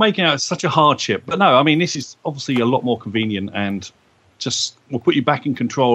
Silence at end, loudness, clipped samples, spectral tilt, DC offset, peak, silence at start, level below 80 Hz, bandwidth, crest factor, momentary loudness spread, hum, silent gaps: 0 s; -18 LUFS; under 0.1%; -4.5 dB/octave; under 0.1%; 0 dBFS; 0 s; -62 dBFS; 10.5 kHz; 18 dB; 11 LU; none; none